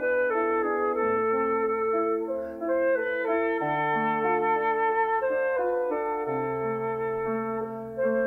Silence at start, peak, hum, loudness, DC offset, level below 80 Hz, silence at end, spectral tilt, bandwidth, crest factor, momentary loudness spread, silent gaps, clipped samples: 0 s; -14 dBFS; none; -27 LUFS; under 0.1%; -62 dBFS; 0 s; -8 dB/octave; 3.9 kHz; 12 dB; 5 LU; none; under 0.1%